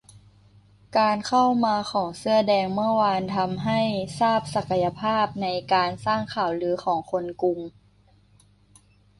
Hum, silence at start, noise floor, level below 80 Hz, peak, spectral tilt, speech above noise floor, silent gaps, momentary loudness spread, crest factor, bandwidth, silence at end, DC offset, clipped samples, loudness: 50 Hz at -50 dBFS; 0.15 s; -58 dBFS; -58 dBFS; -8 dBFS; -5.5 dB/octave; 35 dB; none; 6 LU; 16 dB; 11.5 kHz; 1.5 s; under 0.1%; under 0.1%; -24 LUFS